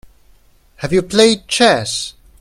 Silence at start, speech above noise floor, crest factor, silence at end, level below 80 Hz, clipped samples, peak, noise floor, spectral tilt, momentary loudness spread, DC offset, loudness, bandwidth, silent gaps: 0.8 s; 36 dB; 16 dB; 0.3 s; -46 dBFS; under 0.1%; 0 dBFS; -50 dBFS; -3.5 dB/octave; 13 LU; under 0.1%; -14 LUFS; 15 kHz; none